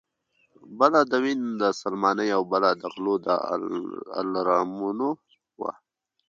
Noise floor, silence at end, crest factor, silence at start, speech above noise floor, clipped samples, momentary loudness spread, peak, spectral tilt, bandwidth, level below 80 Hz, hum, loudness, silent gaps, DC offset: -71 dBFS; 0.6 s; 22 dB; 0.65 s; 46 dB; under 0.1%; 12 LU; -4 dBFS; -5.5 dB/octave; 7.8 kHz; -74 dBFS; none; -25 LUFS; none; under 0.1%